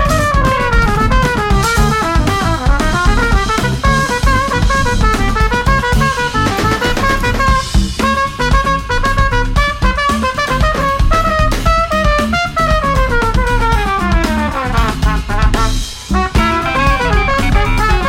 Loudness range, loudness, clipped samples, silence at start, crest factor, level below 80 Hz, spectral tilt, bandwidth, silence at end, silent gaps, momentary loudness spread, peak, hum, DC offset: 1 LU; -13 LUFS; under 0.1%; 0 s; 12 dB; -16 dBFS; -5 dB/octave; 16 kHz; 0 s; none; 2 LU; 0 dBFS; none; under 0.1%